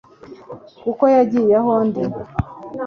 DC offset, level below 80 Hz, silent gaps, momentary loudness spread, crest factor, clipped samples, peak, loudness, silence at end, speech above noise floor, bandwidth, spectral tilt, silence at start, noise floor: under 0.1%; -42 dBFS; none; 22 LU; 16 dB; under 0.1%; -2 dBFS; -18 LUFS; 0 s; 22 dB; 6.6 kHz; -9.5 dB/octave; 0.25 s; -38 dBFS